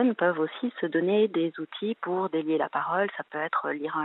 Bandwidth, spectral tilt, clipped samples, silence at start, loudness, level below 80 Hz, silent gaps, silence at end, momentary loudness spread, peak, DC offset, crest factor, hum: 4.1 kHz; -9.5 dB/octave; under 0.1%; 0 s; -28 LUFS; -86 dBFS; none; 0 s; 7 LU; -10 dBFS; under 0.1%; 18 dB; none